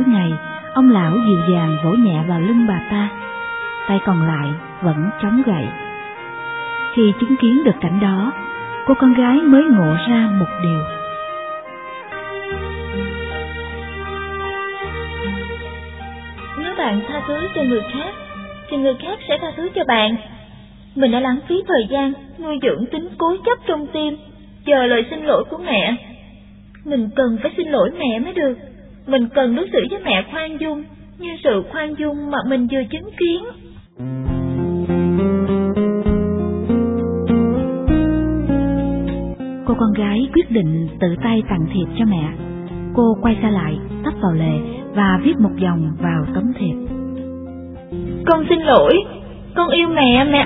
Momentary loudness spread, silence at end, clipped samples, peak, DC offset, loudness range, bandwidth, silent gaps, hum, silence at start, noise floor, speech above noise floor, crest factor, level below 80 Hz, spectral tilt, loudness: 14 LU; 0 s; under 0.1%; 0 dBFS; under 0.1%; 8 LU; 4 kHz; none; none; 0 s; -41 dBFS; 25 dB; 18 dB; -36 dBFS; -10.5 dB/octave; -18 LUFS